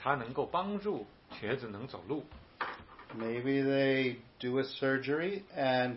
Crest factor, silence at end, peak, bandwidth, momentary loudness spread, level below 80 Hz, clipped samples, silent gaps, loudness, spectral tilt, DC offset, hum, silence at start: 20 dB; 0 s; -14 dBFS; 5.8 kHz; 13 LU; -66 dBFS; under 0.1%; none; -34 LUFS; -9.5 dB/octave; under 0.1%; none; 0 s